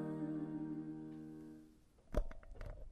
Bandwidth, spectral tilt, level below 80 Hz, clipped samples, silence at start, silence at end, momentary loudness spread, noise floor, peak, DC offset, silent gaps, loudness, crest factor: 12.5 kHz; -8.5 dB/octave; -50 dBFS; under 0.1%; 0 s; 0 s; 13 LU; -65 dBFS; -24 dBFS; under 0.1%; none; -47 LUFS; 22 dB